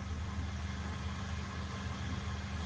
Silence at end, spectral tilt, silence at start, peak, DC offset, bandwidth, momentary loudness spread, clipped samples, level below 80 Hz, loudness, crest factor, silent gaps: 0 s; -5.5 dB/octave; 0 s; -28 dBFS; under 0.1%; 9.2 kHz; 1 LU; under 0.1%; -46 dBFS; -40 LUFS; 12 dB; none